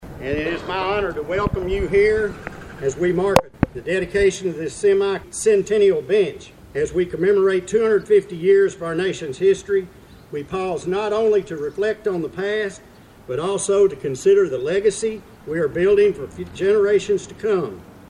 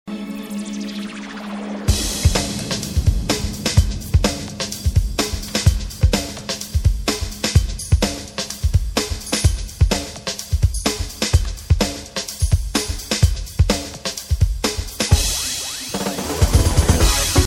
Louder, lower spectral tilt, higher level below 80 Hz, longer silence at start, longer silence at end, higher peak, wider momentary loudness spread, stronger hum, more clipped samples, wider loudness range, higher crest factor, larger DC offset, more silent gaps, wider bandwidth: about the same, -20 LUFS vs -20 LUFS; about the same, -5 dB/octave vs -4 dB/octave; second, -42 dBFS vs -24 dBFS; about the same, 0 s vs 0.05 s; about the same, 0.05 s vs 0 s; about the same, 0 dBFS vs 0 dBFS; about the same, 10 LU vs 10 LU; neither; neither; first, 4 LU vs 1 LU; about the same, 20 dB vs 18 dB; neither; neither; second, 12 kHz vs 17.5 kHz